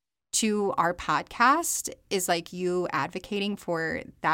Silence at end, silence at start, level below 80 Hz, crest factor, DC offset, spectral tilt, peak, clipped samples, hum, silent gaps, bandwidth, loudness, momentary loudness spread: 0 s; 0.35 s; -58 dBFS; 18 dB; under 0.1%; -3 dB/octave; -10 dBFS; under 0.1%; none; none; 17 kHz; -27 LUFS; 8 LU